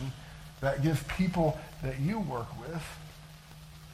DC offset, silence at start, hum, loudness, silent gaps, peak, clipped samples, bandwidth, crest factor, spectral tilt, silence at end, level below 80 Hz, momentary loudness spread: under 0.1%; 0 s; none; -33 LUFS; none; -16 dBFS; under 0.1%; 15.5 kHz; 18 dB; -7 dB/octave; 0 s; -48 dBFS; 21 LU